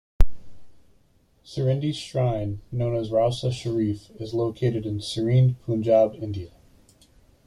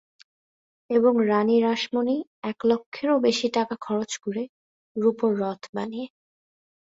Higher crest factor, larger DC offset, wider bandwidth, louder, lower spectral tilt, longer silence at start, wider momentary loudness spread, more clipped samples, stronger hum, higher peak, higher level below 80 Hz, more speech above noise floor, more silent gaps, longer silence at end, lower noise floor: first, 22 dB vs 16 dB; neither; first, 11 kHz vs 8 kHz; about the same, -25 LUFS vs -24 LUFS; first, -7.5 dB/octave vs -5 dB/octave; second, 0.2 s vs 0.9 s; about the same, 12 LU vs 13 LU; neither; neither; first, -2 dBFS vs -8 dBFS; first, -34 dBFS vs -70 dBFS; second, 38 dB vs over 66 dB; second, none vs 2.27-2.42 s, 2.86-2.92 s, 4.49-4.95 s, 5.69-5.73 s; first, 1 s vs 0.75 s; second, -61 dBFS vs under -90 dBFS